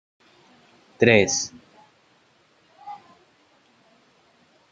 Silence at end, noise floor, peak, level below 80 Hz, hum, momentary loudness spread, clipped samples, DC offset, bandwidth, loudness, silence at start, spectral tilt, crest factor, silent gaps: 1.75 s; -61 dBFS; -2 dBFS; -64 dBFS; none; 27 LU; under 0.1%; under 0.1%; 9.4 kHz; -20 LUFS; 1 s; -3.5 dB/octave; 26 dB; none